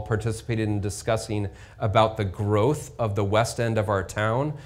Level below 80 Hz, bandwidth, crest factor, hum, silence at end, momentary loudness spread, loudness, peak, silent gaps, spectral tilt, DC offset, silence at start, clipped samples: -48 dBFS; 15 kHz; 20 dB; none; 0 s; 6 LU; -25 LUFS; -4 dBFS; none; -6 dB/octave; under 0.1%; 0 s; under 0.1%